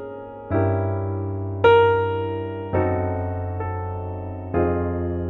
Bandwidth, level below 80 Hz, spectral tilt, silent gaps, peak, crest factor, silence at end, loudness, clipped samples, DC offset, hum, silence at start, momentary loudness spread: 4.1 kHz; -44 dBFS; -9.5 dB/octave; none; -4 dBFS; 18 dB; 0 s; -23 LUFS; under 0.1%; under 0.1%; none; 0 s; 14 LU